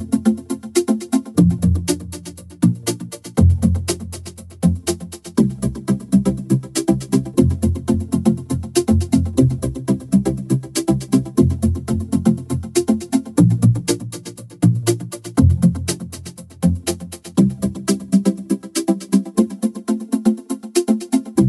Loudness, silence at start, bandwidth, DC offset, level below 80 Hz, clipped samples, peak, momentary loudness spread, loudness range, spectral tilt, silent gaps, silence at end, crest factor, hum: -19 LUFS; 0 s; 14 kHz; under 0.1%; -34 dBFS; under 0.1%; -2 dBFS; 9 LU; 2 LU; -6.5 dB/octave; none; 0 s; 16 dB; none